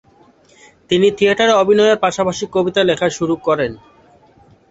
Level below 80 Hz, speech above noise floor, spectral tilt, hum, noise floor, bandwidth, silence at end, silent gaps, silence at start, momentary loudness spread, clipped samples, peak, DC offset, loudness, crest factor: -52 dBFS; 35 dB; -4.5 dB/octave; none; -50 dBFS; 8 kHz; 0.95 s; none; 0.9 s; 7 LU; under 0.1%; -2 dBFS; under 0.1%; -15 LUFS; 14 dB